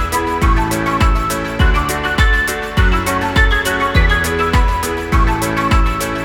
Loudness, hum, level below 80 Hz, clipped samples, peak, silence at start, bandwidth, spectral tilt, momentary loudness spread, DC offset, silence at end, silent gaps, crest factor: -15 LUFS; none; -18 dBFS; under 0.1%; 0 dBFS; 0 s; 17.5 kHz; -5 dB/octave; 4 LU; under 0.1%; 0 s; none; 14 dB